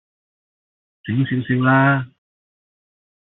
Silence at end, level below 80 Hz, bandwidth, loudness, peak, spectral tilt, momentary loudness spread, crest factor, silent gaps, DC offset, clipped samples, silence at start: 1.15 s; -60 dBFS; 4 kHz; -18 LUFS; -4 dBFS; -6 dB/octave; 18 LU; 18 dB; none; under 0.1%; under 0.1%; 1.05 s